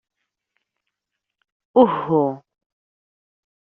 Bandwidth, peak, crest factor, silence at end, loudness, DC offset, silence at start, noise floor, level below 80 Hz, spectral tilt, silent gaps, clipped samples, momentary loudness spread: 4.3 kHz; -2 dBFS; 22 dB; 1.4 s; -19 LUFS; under 0.1%; 1.75 s; -82 dBFS; -64 dBFS; -7 dB/octave; none; under 0.1%; 10 LU